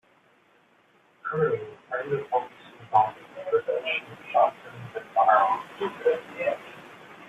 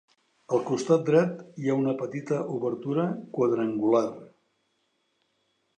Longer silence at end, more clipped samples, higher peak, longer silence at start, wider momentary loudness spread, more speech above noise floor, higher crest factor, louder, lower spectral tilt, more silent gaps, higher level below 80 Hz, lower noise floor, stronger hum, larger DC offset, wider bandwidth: second, 0 s vs 1.5 s; neither; about the same, -8 dBFS vs -8 dBFS; first, 1.25 s vs 0.5 s; first, 17 LU vs 8 LU; second, 37 dB vs 48 dB; about the same, 20 dB vs 20 dB; about the same, -26 LUFS vs -27 LUFS; second, -6 dB/octave vs -7.5 dB/octave; neither; about the same, -74 dBFS vs -78 dBFS; second, -62 dBFS vs -74 dBFS; neither; neither; about the same, 9 kHz vs 9.6 kHz